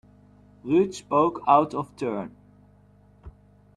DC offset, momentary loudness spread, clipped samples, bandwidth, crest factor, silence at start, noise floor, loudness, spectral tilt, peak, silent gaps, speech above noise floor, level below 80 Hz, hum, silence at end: under 0.1%; 15 LU; under 0.1%; 11 kHz; 22 dB; 0.65 s; -56 dBFS; -24 LUFS; -6.5 dB/octave; -6 dBFS; none; 33 dB; -58 dBFS; 50 Hz at -50 dBFS; 0.45 s